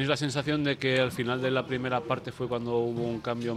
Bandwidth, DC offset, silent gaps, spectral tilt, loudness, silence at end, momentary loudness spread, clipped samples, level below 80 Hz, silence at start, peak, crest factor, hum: 13.5 kHz; under 0.1%; none; -5.5 dB/octave; -29 LUFS; 0 s; 6 LU; under 0.1%; -60 dBFS; 0 s; -12 dBFS; 18 dB; none